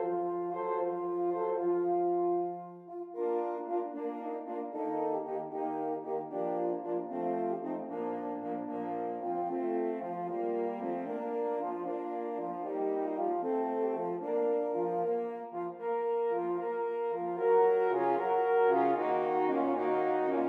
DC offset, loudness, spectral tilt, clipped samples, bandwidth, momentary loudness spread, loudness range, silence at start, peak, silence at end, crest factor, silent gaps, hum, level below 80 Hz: under 0.1%; -33 LUFS; -9 dB/octave; under 0.1%; 4.2 kHz; 9 LU; 6 LU; 0 s; -16 dBFS; 0 s; 16 dB; none; none; under -90 dBFS